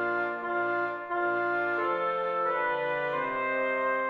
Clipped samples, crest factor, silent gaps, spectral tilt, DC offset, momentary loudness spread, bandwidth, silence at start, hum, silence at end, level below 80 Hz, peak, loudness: under 0.1%; 10 dB; none; -6.5 dB/octave; under 0.1%; 3 LU; 6.8 kHz; 0 s; none; 0 s; -70 dBFS; -18 dBFS; -29 LUFS